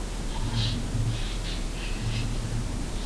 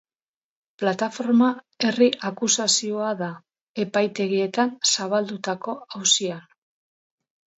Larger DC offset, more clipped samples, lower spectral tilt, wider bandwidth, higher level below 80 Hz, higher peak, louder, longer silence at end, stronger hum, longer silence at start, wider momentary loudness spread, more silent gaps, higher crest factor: first, 0.3% vs under 0.1%; neither; first, -5 dB/octave vs -2.5 dB/octave; first, 11 kHz vs 8.2 kHz; first, -32 dBFS vs -76 dBFS; second, -14 dBFS vs -6 dBFS; second, -31 LUFS vs -22 LUFS; second, 0 s vs 1.15 s; neither; second, 0 s vs 0.8 s; second, 5 LU vs 11 LU; second, none vs 3.61-3.75 s; about the same, 14 dB vs 18 dB